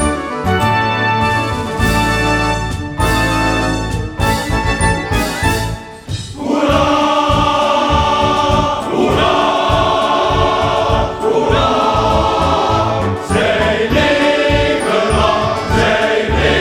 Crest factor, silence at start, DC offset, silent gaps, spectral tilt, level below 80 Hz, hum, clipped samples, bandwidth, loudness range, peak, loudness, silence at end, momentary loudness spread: 14 dB; 0 s; under 0.1%; none; -5 dB/octave; -26 dBFS; none; under 0.1%; 19 kHz; 3 LU; 0 dBFS; -14 LUFS; 0 s; 5 LU